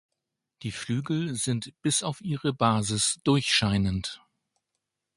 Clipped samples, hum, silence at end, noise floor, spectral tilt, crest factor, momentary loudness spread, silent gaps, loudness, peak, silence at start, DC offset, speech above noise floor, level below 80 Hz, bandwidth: under 0.1%; none; 1 s; -84 dBFS; -4 dB/octave; 22 dB; 13 LU; none; -27 LUFS; -8 dBFS; 0.6 s; under 0.1%; 57 dB; -50 dBFS; 11.5 kHz